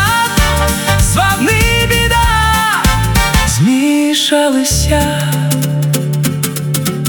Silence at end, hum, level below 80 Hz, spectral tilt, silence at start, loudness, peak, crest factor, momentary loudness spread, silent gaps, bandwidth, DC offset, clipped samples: 0 s; none; -20 dBFS; -4 dB/octave; 0 s; -12 LUFS; 0 dBFS; 12 dB; 4 LU; none; 18.5 kHz; under 0.1%; under 0.1%